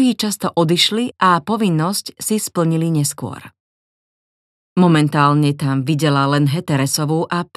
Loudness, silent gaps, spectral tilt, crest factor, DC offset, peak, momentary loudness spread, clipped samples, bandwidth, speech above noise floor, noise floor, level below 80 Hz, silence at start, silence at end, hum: -16 LUFS; 3.60-4.76 s; -5 dB/octave; 16 dB; under 0.1%; 0 dBFS; 7 LU; under 0.1%; 14.5 kHz; over 74 dB; under -90 dBFS; -62 dBFS; 0 s; 0.15 s; none